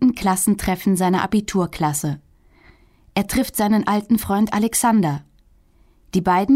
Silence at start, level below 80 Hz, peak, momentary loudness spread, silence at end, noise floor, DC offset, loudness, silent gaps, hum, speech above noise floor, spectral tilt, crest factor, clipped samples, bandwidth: 0 s; -44 dBFS; -6 dBFS; 7 LU; 0 s; -54 dBFS; under 0.1%; -20 LUFS; none; none; 36 dB; -5 dB/octave; 14 dB; under 0.1%; 16 kHz